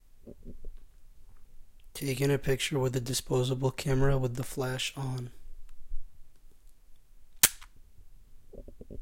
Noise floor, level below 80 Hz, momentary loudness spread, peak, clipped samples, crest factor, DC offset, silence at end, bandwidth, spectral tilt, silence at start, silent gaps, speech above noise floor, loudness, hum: -51 dBFS; -44 dBFS; 26 LU; -4 dBFS; under 0.1%; 30 dB; under 0.1%; 0 s; 16.5 kHz; -4 dB/octave; 0.15 s; none; 22 dB; -30 LUFS; none